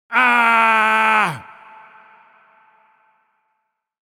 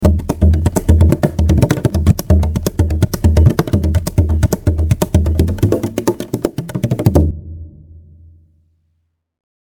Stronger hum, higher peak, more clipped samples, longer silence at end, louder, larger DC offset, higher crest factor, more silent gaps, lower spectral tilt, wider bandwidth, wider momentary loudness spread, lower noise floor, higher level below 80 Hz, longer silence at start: neither; about the same, 0 dBFS vs 0 dBFS; neither; first, 2.65 s vs 2 s; about the same, -14 LUFS vs -15 LUFS; neither; first, 20 dB vs 14 dB; neither; second, -3.5 dB/octave vs -7.5 dB/octave; about the same, 18 kHz vs 18 kHz; about the same, 8 LU vs 8 LU; first, -73 dBFS vs -66 dBFS; second, -72 dBFS vs -20 dBFS; about the same, 0.1 s vs 0 s